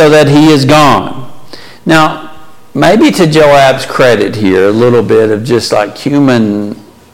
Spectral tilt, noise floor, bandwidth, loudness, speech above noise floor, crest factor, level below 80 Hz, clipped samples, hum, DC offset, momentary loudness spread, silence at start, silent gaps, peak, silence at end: -5.5 dB/octave; -30 dBFS; 16.5 kHz; -7 LUFS; 23 dB; 8 dB; -38 dBFS; 0.1%; none; under 0.1%; 14 LU; 0 s; none; 0 dBFS; 0.35 s